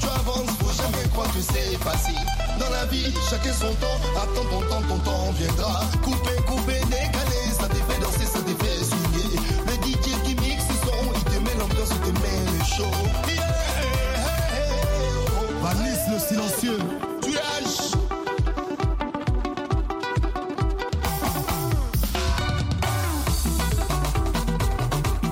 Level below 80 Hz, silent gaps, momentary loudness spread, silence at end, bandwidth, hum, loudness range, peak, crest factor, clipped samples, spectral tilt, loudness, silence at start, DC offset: -26 dBFS; none; 3 LU; 0 s; 16.5 kHz; none; 2 LU; -10 dBFS; 12 dB; under 0.1%; -4.5 dB/octave; -25 LUFS; 0 s; under 0.1%